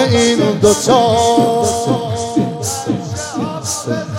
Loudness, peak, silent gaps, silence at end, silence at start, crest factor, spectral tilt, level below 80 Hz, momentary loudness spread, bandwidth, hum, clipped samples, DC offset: -15 LUFS; 0 dBFS; none; 0 s; 0 s; 14 dB; -4.5 dB/octave; -48 dBFS; 9 LU; 16.5 kHz; none; under 0.1%; under 0.1%